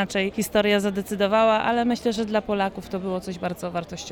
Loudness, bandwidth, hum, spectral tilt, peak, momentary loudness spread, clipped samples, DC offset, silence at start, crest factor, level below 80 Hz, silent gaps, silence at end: -24 LUFS; 18.5 kHz; none; -5 dB/octave; -6 dBFS; 11 LU; under 0.1%; under 0.1%; 0 s; 16 dB; -52 dBFS; none; 0 s